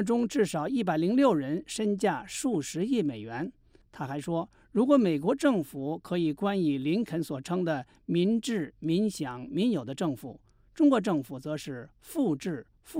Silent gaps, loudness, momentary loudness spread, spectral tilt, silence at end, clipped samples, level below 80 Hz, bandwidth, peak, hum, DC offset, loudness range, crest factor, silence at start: none; -29 LUFS; 12 LU; -6 dB/octave; 0 s; under 0.1%; -64 dBFS; 16 kHz; -10 dBFS; none; under 0.1%; 3 LU; 18 dB; 0 s